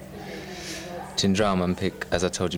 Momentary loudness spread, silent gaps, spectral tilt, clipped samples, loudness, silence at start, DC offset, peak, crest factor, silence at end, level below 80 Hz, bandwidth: 14 LU; none; -4.5 dB/octave; under 0.1%; -26 LUFS; 0 s; under 0.1%; -6 dBFS; 20 dB; 0 s; -48 dBFS; 16.5 kHz